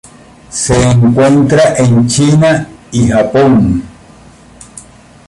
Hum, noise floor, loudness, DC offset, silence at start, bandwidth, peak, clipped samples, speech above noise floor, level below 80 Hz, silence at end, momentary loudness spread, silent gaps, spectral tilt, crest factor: none; -38 dBFS; -9 LUFS; under 0.1%; 0.5 s; 11.5 kHz; 0 dBFS; under 0.1%; 30 dB; -32 dBFS; 0.5 s; 9 LU; none; -6 dB/octave; 10 dB